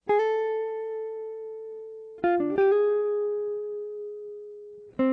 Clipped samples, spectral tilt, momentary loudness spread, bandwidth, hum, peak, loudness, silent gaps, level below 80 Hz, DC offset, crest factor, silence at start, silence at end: under 0.1%; -7.5 dB/octave; 18 LU; 5.2 kHz; none; -16 dBFS; -27 LUFS; none; -68 dBFS; under 0.1%; 12 dB; 0.05 s; 0 s